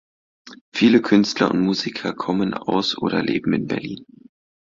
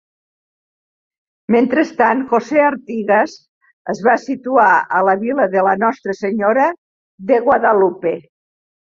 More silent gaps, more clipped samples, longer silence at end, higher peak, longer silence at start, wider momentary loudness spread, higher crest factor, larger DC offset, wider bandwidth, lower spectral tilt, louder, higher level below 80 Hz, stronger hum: second, 0.61-0.72 s vs 3.49-3.61 s, 3.73-3.85 s, 6.78-7.18 s; neither; about the same, 0.65 s vs 0.6 s; about the same, -2 dBFS vs 0 dBFS; second, 0.45 s vs 1.5 s; about the same, 11 LU vs 10 LU; about the same, 18 dB vs 16 dB; neither; about the same, 7.6 kHz vs 7.4 kHz; about the same, -5.5 dB/octave vs -6.5 dB/octave; second, -20 LUFS vs -15 LUFS; about the same, -58 dBFS vs -62 dBFS; neither